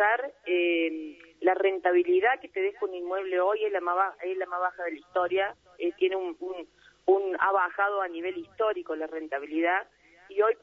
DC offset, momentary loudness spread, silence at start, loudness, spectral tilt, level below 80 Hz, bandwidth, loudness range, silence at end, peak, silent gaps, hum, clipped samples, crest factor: under 0.1%; 10 LU; 0 s; -28 LUFS; -5 dB/octave; -74 dBFS; 4 kHz; 3 LU; 0.05 s; -10 dBFS; none; none; under 0.1%; 18 dB